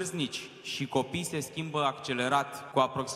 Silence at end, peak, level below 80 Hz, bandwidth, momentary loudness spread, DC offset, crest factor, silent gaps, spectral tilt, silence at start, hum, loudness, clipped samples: 0 s; -12 dBFS; -68 dBFS; 16 kHz; 7 LU; under 0.1%; 20 dB; none; -4 dB/octave; 0 s; none; -31 LUFS; under 0.1%